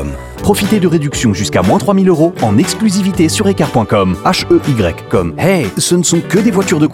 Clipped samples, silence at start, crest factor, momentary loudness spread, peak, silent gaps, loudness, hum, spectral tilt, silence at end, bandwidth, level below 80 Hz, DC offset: under 0.1%; 0 s; 10 dB; 4 LU; 0 dBFS; none; -12 LUFS; none; -5 dB/octave; 0 s; 16.5 kHz; -36 dBFS; under 0.1%